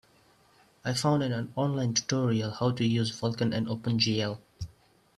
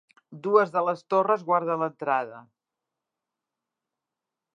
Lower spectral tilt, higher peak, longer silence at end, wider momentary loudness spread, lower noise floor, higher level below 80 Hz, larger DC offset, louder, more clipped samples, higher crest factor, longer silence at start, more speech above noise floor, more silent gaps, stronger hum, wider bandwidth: second, -5 dB/octave vs -7.5 dB/octave; second, -12 dBFS vs -6 dBFS; second, 0.5 s vs 2.15 s; first, 11 LU vs 6 LU; second, -62 dBFS vs -87 dBFS; first, -60 dBFS vs -86 dBFS; neither; second, -29 LUFS vs -25 LUFS; neither; about the same, 18 dB vs 22 dB; first, 0.85 s vs 0.3 s; second, 34 dB vs 62 dB; neither; neither; first, 13 kHz vs 7.4 kHz